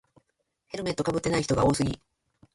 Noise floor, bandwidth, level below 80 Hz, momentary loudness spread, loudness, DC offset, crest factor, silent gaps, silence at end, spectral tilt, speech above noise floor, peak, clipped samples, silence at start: -77 dBFS; 11.5 kHz; -48 dBFS; 14 LU; -27 LUFS; under 0.1%; 18 dB; none; 0.6 s; -5.5 dB/octave; 50 dB; -10 dBFS; under 0.1%; 0.75 s